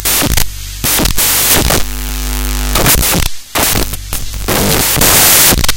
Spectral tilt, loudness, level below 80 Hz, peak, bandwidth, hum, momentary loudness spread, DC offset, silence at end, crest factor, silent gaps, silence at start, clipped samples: -2 dB/octave; -10 LUFS; -20 dBFS; 0 dBFS; over 20 kHz; none; 14 LU; under 0.1%; 0 s; 12 dB; none; 0 s; 0.4%